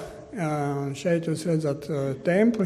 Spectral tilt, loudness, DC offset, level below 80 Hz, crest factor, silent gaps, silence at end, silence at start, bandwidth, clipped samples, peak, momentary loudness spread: -7 dB/octave; -26 LUFS; under 0.1%; -58 dBFS; 16 dB; none; 0 s; 0 s; 14 kHz; under 0.1%; -10 dBFS; 7 LU